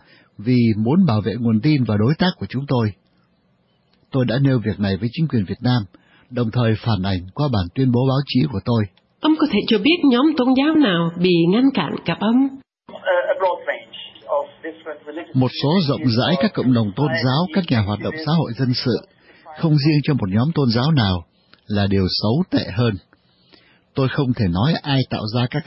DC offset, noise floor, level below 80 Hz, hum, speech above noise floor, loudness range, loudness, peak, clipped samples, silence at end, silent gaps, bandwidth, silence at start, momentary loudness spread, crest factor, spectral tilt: under 0.1%; -61 dBFS; -54 dBFS; none; 44 dB; 5 LU; -19 LUFS; -4 dBFS; under 0.1%; 0.05 s; none; 5.8 kHz; 0.4 s; 9 LU; 14 dB; -10.5 dB/octave